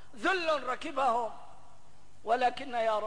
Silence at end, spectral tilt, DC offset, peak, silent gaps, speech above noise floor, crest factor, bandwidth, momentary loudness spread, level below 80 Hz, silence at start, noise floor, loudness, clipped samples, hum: 0 s; -3 dB/octave; 0.8%; -16 dBFS; none; 31 dB; 14 dB; 10.5 kHz; 10 LU; -66 dBFS; 0.15 s; -61 dBFS; -31 LUFS; under 0.1%; none